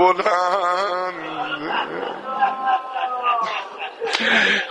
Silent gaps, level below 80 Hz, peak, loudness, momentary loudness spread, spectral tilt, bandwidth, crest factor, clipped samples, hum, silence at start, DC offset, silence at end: none; -68 dBFS; 0 dBFS; -21 LUFS; 11 LU; -2.5 dB/octave; 11.5 kHz; 20 dB; under 0.1%; none; 0 s; under 0.1%; 0 s